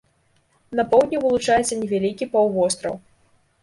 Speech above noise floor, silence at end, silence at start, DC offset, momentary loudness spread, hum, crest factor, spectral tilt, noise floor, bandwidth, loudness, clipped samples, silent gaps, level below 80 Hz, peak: 43 dB; 0.65 s; 0.7 s; under 0.1%; 10 LU; none; 18 dB; -4 dB/octave; -63 dBFS; 11.5 kHz; -21 LUFS; under 0.1%; none; -54 dBFS; -4 dBFS